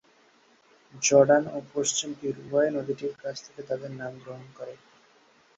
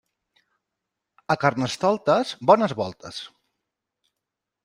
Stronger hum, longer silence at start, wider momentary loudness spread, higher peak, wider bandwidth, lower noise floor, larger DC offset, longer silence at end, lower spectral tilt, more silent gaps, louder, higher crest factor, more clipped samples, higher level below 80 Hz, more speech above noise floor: neither; second, 0.95 s vs 1.3 s; first, 22 LU vs 17 LU; second, -6 dBFS vs -2 dBFS; second, 8.2 kHz vs 11.5 kHz; second, -61 dBFS vs -84 dBFS; neither; second, 0.8 s vs 1.4 s; second, -3.5 dB/octave vs -5.5 dB/octave; neither; second, -26 LUFS vs -22 LUFS; about the same, 22 dB vs 22 dB; neither; second, -70 dBFS vs -64 dBFS; second, 34 dB vs 63 dB